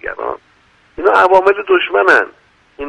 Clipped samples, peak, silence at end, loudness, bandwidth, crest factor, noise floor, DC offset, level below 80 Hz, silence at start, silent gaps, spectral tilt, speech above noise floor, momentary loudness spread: under 0.1%; 0 dBFS; 0 s; -12 LUFS; 9.8 kHz; 14 dB; -51 dBFS; under 0.1%; -48 dBFS; 0.05 s; none; -4 dB/octave; 40 dB; 15 LU